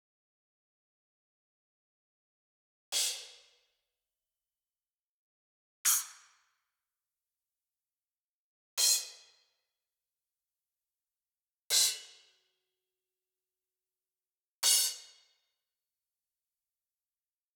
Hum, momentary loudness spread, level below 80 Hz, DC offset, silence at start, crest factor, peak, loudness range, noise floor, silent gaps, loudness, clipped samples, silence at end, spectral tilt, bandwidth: none; 17 LU; under -90 dBFS; under 0.1%; 2.9 s; 28 dB; -12 dBFS; 6 LU; under -90 dBFS; 4.93-5.85 s, 8.04-8.77 s, 11.48-11.70 s, 14.47-14.63 s; -29 LUFS; under 0.1%; 2.55 s; 4.5 dB/octave; over 20 kHz